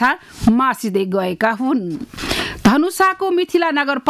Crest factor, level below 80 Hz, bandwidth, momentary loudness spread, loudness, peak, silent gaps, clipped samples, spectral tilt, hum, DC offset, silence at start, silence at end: 12 dB; -40 dBFS; 15.5 kHz; 6 LU; -17 LUFS; -4 dBFS; none; under 0.1%; -5 dB/octave; none; under 0.1%; 0 s; 0 s